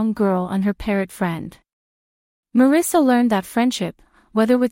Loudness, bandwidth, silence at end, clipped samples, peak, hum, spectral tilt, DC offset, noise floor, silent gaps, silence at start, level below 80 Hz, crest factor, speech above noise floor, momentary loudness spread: -19 LUFS; 16.5 kHz; 0 s; under 0.1%; -4 dBFS; none; -5.5 dB/octave; under 0.1%; under -90 dBFS; 1.73-2.43 s; 0 s; -48 dBFS; 16 dB; over 72 dB; 11 LU